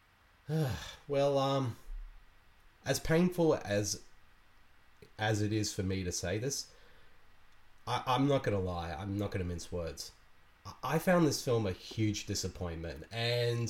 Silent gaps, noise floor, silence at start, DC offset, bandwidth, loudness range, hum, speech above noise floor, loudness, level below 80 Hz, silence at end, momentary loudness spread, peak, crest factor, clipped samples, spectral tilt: none; -61 dBFS; 0.5 s; under 0.1%; 17 kHz; 3 LU; none; 28 dB; -34 LUFS; -54 dBFS; 0 s; 14 LU; -16 dBFS; 18 dB; under 0.1%; -5 dB/octave